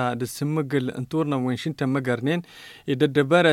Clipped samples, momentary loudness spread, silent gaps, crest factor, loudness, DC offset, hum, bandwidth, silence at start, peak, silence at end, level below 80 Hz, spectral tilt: under 0.1%; 9 LU; none; 18 dB; -24 LUFS; under 0.1%; none; 17 kHz; 0 s; -6 dBFS; 0 s; -64 dBFS; -6.5 dB/octave